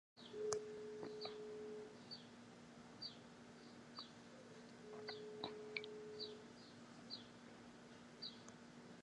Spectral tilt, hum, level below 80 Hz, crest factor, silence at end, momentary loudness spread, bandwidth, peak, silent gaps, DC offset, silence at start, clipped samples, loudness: -3 dB/octave; none; -84 dBFS; 32 dB; 0 s; 12 LU; 11 kHz; -22 dBFS; none; under 0.1%; 0.15 s; under 0.1%; -53 LUFS